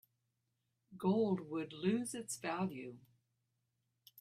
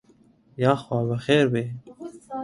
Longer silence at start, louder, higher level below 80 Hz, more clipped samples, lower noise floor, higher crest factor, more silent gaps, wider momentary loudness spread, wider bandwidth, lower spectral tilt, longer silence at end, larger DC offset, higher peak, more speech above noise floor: first, 0.9 s vs 0.6 s; second, -38 LUFS vs -23 LUFS; second, -82 dBFS vs -62 dBFS; neither; first, -85 dBFS vs -58 dBFS; about the same, 18 dB vs 20 dB; neither; second, 9 LU vs 21 LU; first, 14.5 kHz vs 11.5 kHz; second, -5.5 dB/octave vs -7 dB/octave; about the same, 0 s vs 0 s; neither; second, -22 dBFS vs -6 dBFS; first, 47 dB vs 35 dB